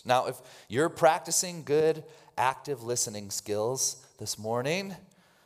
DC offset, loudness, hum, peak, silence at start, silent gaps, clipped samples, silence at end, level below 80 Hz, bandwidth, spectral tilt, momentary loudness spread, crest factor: under 0.1%; -29 LUFS; none; -8 dBFS; 0.05 s; none; under 0.1%; 0.45 s; -74 dBFS; 16 kHz; -3 dB/octave; 12 LU; 20 dB